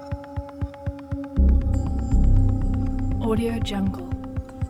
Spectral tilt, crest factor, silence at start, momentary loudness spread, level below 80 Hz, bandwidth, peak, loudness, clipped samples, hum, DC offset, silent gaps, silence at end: -8 dB/octave; 14 dB; 0 s; 12 LU; -24 dBFS; 11.5 kHz; -8 dBFS; -25 LUFS; under 0.1%; none; under 0.1%; none; 0 s